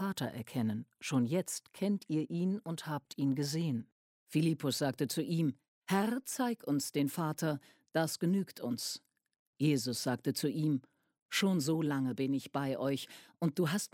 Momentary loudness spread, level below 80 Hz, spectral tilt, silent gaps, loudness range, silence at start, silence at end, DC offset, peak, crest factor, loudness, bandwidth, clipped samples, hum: 7 LU; -78 dBFS; -5.5 dB/octave; 3.92-4.27 s, 5.68-5.82 s, 9.39-9.53 s, 11.22-11.29 s; 2 LU; 0 s; 0.05 s; under 0.1%; -18 dBFS; 18 dB; -35 LUFS; 16.5 kHz; under 0.1%; none